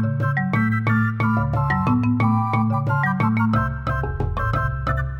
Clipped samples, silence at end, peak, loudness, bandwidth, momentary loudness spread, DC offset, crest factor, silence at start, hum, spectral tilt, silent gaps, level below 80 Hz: under 0.1%; 0 s; -8 dBFS; -21 LUFS; 5.6 kHz; 5 LU; under 0.1%; 12 dB; 0 s; none; -9 dB/octave; none; -34 dBFS